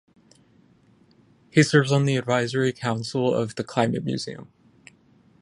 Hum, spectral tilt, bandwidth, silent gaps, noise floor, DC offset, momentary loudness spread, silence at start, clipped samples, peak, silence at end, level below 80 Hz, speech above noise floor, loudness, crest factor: none; -5.5 dB/octave; 11.5 kHz; none; -58 dBFS; under 0.1%; 11 LU; 1.55 s; under 0.1%; -4 dBFS; 1 s; -64 dBFS; 35 dB; -23 LUFS; 22 dB